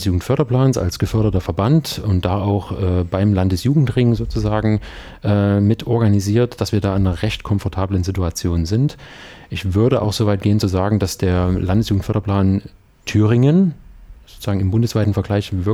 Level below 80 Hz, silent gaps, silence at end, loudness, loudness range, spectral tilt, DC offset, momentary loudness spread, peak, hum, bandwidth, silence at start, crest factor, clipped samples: -34 dBFS; none; 0 s; -18 LUFS; 2 LU; -7 dB/octave; under 0.1%; 6 LU; -2 dBFS; none; 14 kHz; 0 s; 14 dB; under 0.1%